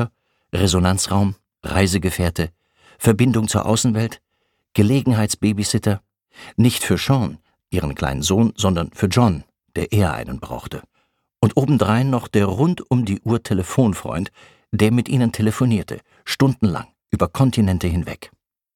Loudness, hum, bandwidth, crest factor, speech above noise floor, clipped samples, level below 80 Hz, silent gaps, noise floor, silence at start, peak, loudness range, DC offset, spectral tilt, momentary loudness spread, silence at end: -19 LUFS; none; 17.5 kHz; 18 dB; 52 dB; under 0.1%; -40 dBFS; none; -71 dBFS; 0 s; -2 dBFS; 2 LU; under 0.1%; -5.5 dB/octave; 11 LU; 0.5 s